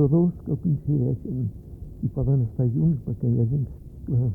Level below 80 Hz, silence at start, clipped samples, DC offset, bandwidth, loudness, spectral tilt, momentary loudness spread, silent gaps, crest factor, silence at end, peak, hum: -42 dBFS; 0 s; under 0.1%; under 0.1%; 1.5 kHz; -25 LUFS; -14 dB/octave; 10 LU; none; 14 dB; 0 s; -10 dBFS; none